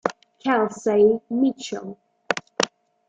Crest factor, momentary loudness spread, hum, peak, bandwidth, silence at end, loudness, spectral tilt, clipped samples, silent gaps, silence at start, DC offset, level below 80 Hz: 22 dB; 14 LU; none; -2 dBFS; 9.2 kHz; 0.4 s; -23 LUFS; -4 dB/octave; under 0.1%; none; 0.05 s; under 0.1%; -66 dBFS